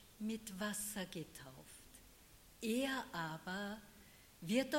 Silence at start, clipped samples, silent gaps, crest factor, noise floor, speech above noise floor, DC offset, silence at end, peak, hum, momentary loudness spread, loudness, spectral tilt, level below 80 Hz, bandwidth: 0 s; under 0.1%; none; 20 dB; -64 dBFS; 22 dB; under 0.1%; 0 s; -22 dBFS; none; 22 LU; -43 LUFS; -4 dB/octave; -70 dBFS; 16.5 kHz